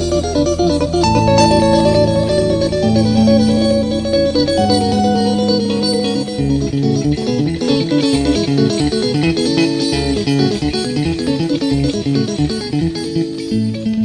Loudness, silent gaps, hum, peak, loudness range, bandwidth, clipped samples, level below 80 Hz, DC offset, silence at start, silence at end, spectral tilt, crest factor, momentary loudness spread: -15 LUFS; none; none; 0 dBFS; 4 LU; 10.5 kHz; under 0.1%; -32 dBFS; under 0.1%; 0 s; 0 s; -6 dB/octave; 14 dB; 6 LU